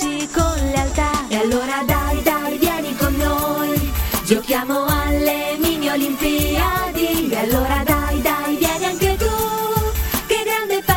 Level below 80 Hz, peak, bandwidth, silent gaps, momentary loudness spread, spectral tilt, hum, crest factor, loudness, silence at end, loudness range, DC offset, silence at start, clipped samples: -26 dBFS; 0 dBFS; 17 kHz; none; 2 LU; -4.5 dB/octave; none; 18 dB; -19 LUFS; 0 s; 1 LU; under 0.1%; 0 s; under 0.1%